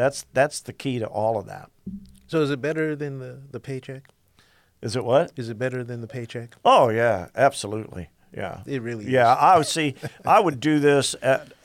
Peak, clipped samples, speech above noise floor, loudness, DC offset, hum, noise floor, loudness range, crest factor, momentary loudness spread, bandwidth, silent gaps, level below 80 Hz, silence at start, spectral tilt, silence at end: -6 dBFS; under 0.1%; 37 dB; -22 LUFS; under 0.1%; none; -59 dBFS; 8 LU; 18 dB; 21 LU; 16 kHz; none; -60 dBFS; 0 s; -5 dB/octave; 0.2 s